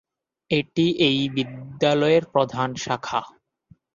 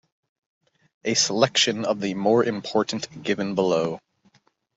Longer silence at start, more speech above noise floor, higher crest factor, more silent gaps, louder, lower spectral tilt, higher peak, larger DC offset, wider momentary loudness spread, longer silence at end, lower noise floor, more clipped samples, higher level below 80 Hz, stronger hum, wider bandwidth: second, 0.5 s vs 1.05 s; second, 35 dB vs 40 dB; about the same, 18 dB vs 22 dB; neither; about the same, -22 LUFS vs -23 LUFS; first, -5.5 dB/octave vs -3.5 dB/octave; about the same, -4 dBFS vs -4 dBFS; neither; about the same, 9 LU vs 10 LU; second, 0.65 s vs 0.8 s; second, -57 dBFS vs -63 dBFS; neither; first, -60 dBFS vs -68 dBFS; neither; second, 7.4 kHz vs 8.2 kHz